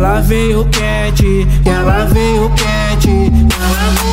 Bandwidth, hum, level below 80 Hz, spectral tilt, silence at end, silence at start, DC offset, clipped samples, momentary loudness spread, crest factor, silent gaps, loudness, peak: 16.5 kHz; none; -14 dBFS; -5.5 dB/octave; 0 s; 0 s; under 0.1%; under 0.1%; 2 LU; 10 dB; none; -12 LUFS; 0 dBFS